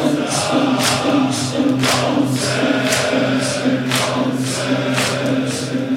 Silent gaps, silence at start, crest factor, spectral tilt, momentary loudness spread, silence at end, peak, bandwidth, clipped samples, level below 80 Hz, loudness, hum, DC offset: none; 0 s; 16 dB; -4 dB/octave; 4 LU; 0 s; -2 dBFS; 16.5 kHz; under 0.1%; -54 dBFS; -17 LUFS; none; under 0.1%